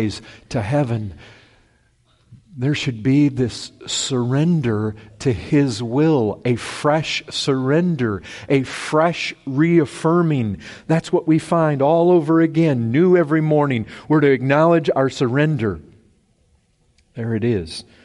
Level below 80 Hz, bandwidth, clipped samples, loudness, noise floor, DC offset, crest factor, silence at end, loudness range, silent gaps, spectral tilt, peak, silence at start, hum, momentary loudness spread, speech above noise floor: -50 dBFS; 11.5 kHz; under 0.1%; -18 LUFS; -60 dBFS; under 0.1%; 14 dB; 0.25 s; 6 LU; none; -6.5 dB/octave; -4 dBFS; 0 s; none; 10 LU; 42 dB